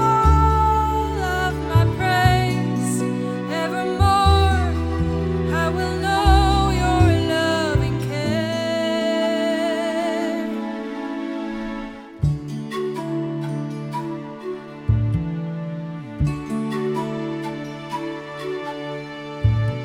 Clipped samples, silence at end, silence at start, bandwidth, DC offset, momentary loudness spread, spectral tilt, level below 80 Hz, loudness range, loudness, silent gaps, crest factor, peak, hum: under 0.1%; 0 s; 0 s; 17 kHz; under 0.1%; 13 LU; -6.5 dB/octave; -28 dBFS; 8 LU; -21 LUFS; none; 20 dB; -2 dBFS; none